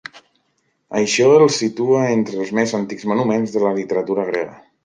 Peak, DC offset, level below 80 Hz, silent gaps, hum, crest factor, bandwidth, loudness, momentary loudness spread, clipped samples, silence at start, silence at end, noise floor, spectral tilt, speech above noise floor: -2 dBFS; under 0.1%; -64 dBFS; none; none; 16 dB; 9.8 kHz; -18 LUFS; 11 LU; under 0.1%; 0.15 s; 0.3 s; -67 dBFS; -5 dB/octave; 50 dB